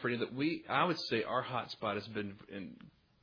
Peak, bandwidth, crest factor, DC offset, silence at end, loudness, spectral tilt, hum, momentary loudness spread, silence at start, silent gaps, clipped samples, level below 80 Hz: -16 dBFS; 5.4 kHz; 20 dB; under 0.1%; 0.35 s; -36 LUFS; -3.5 dB/octave; none; 15 LU; 0 s; none; under 0.1%; -74 dBFS